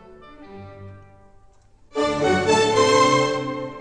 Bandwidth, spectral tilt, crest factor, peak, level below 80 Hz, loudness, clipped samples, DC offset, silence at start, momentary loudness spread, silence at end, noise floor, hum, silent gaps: 10.5 kHz; -4 dB/octave; 18 dB; -4 dBFS; -52 dBFS; -19 LUFS; under 0.1%; 0.1%; 0.3 s; 25 LU; 0 s; -52 dBFS; none; none